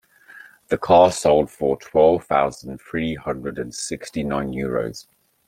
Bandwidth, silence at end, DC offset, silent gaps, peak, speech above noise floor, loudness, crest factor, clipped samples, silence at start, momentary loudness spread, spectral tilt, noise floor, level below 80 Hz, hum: 15.5 kHz; 0.45 s; under 0.1%; none; -2 dBFS; 26 dB; -21 LUFS; 20 dB; under 0.1%; 0.35 s; 14 LU; -5 dB/octave; -46 dBFS; -48 dBFS; none